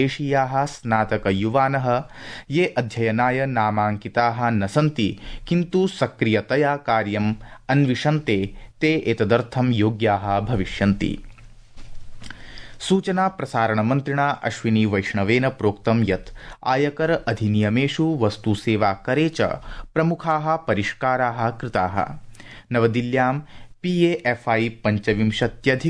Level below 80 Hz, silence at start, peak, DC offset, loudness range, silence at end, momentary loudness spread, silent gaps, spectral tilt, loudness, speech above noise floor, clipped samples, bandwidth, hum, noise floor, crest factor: -44 dBFS; 0 s; -4 dBFS; under 0.1%; 2 LU; 0 s; 6 LU; none; -7 dB/octave; -22 LUFS; 22 dB; under 0.1%; 10.5 kHz; none; -43 dBFS; 16 dB